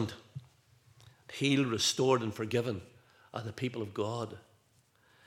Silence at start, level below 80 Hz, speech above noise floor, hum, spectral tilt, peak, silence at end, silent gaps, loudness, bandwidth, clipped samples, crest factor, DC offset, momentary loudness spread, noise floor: 0 s; -76 dBFS; 37 dB; none; -4.5 dB/octave; -14 dBFS; 0.85 s; none; -33 LUFS; 16.5 kHz; under 0.1%; 22 dB; under 0.1%; 19 LU; -69 dBFS